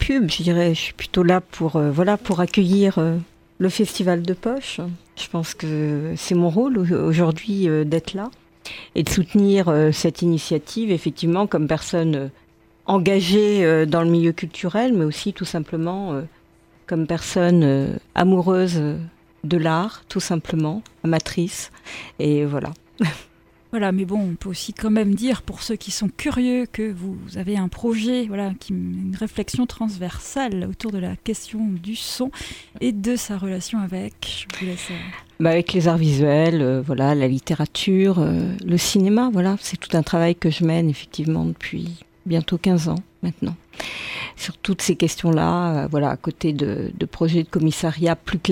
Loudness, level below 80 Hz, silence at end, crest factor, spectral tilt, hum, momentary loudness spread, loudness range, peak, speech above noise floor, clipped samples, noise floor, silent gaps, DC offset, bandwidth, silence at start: -21 LUFS; -46 dBFS; 0 s; 20 dB; -6 dB/octave; none; 12 LU; 6 LU; -2 dBFS; 34 dB; under 0.1%; -54 dBFS; none; under 0.1%; 16.5 kHz; 0 s